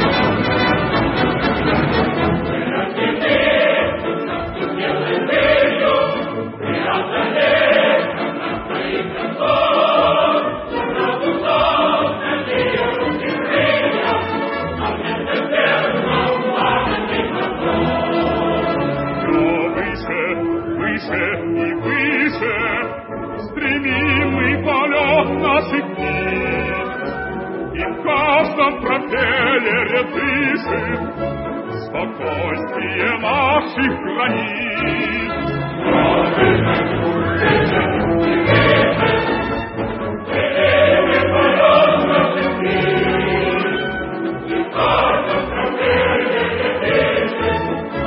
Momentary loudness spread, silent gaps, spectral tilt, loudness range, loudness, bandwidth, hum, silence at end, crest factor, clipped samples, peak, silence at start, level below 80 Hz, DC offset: 9 LU; none; -10.5 dB/octave; 4 LU; -17 LUFS; 5.8 kHz; none; 0 s; 16 dB; under 0.1%; 0 dBFS; 0 s; -40 dBFS; under 0.1%